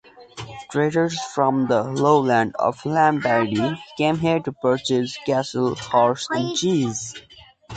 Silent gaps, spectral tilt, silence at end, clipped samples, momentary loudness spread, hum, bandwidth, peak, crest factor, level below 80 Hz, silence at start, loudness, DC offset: none; -5 dB/octave; 0 s; under 0.1%; 10 LU; none; 9.2 kHz; -4 dBFS; 18 dB; -58 dBFS; 0.2 s; -21 LUFS; under 0.1%